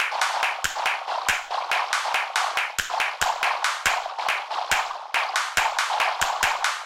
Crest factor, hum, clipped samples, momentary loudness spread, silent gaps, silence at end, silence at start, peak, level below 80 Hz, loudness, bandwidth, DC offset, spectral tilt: 20 dB; none; under 0.1%; 3 LU; none; 0 s; 0 s; -4 dBFS; -54 dBFS; -24 LUFS; 17 kHz; under 0.1%; 1 dB/octave